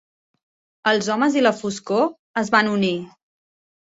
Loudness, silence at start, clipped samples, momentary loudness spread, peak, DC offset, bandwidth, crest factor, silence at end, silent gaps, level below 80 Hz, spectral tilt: -20 LUFS; 0.85 s; under 0.1%; 8 LU; -2 dBFS; under 0.1%; 8 kHz; 20 dB; 0.8 s; 2.19-2.34 s; -66 dBFS; -4.5 dB/octave